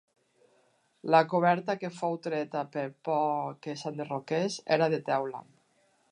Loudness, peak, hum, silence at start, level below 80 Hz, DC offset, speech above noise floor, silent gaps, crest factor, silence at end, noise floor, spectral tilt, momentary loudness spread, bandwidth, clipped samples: -30 LUFS; -8 dBFS; none; 1.05 s; -84 dBFS; under 0.1%; 40 dB; none; 22 dB; 0.7 s; -69 dBFS; -5.5 dB/octave; 12 LU; 11 kHz; under 0.1%